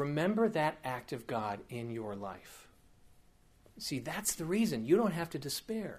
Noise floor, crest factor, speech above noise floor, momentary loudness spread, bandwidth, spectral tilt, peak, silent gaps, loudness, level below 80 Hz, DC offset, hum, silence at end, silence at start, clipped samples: -64 dBFS; 20 dB; 30 dB; 13 LU; 15.5 kHz; -5 dB/octave; -16 dBFS; none; -35 LUFS; -66 dBFS; under 0.1%; none; 0 s; 0 s; under 0.1%